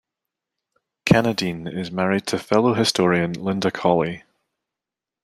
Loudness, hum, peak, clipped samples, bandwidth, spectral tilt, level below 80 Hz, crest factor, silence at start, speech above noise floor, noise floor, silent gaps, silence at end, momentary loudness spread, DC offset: -21 LUFS; none; -2 dBFS; under 0.1%; 14.5 kHz; -5.5 dB/octave; -54 dBFS; 20 dB; 1.05 s; 67 dB; -88 dBFS; none; 1.05 s; 10 LU; under 0.1%